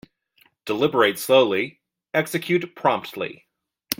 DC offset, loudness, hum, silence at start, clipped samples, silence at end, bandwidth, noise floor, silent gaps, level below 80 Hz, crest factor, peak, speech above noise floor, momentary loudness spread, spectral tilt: under 0.1%; -22 LUFS; none; 0.65 s; under 0.1%; 0.05 s; 16.5 kHz; -62 dBFS; none; -66 dBFS; 24 dB; 0 dBFS; 40 dB; 14 LU; -4.5 dB/octave